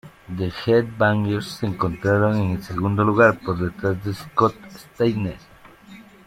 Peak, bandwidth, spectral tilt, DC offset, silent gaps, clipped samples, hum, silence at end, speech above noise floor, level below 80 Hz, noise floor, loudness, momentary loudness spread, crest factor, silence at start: -2 dBFS; 14.5 kHz; -7.5 dB/octave; under 0.1%; none; under 0.1%; none; 0.25 s; 24 dB; -50 dBFS; -45 dBFS; -21 LUFS; 11 LU; 18 dB; 0.05 s